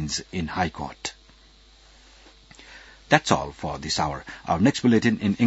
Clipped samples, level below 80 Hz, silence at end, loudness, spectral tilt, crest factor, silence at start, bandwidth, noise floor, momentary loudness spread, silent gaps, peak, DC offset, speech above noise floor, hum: under 0.1%; -50 dBFS; 0 s; -24 LUFS; -5 dB/octave; 24 dB; 0 s; 8 kHz; -53 dBFS; 15 LU; none; 0 dBFS; under 0.1%; 30 dB; none